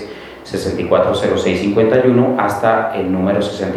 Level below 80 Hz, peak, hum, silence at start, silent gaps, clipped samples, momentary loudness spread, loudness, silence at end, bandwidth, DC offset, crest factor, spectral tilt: -46 dBFS; 0 dBFS; none; 0 s; none; under 0.1%; 10 LU; -15 LUFS; 0 s; 13.5 kHz; under 0.1%; 16 dB; -6.5 dB/octave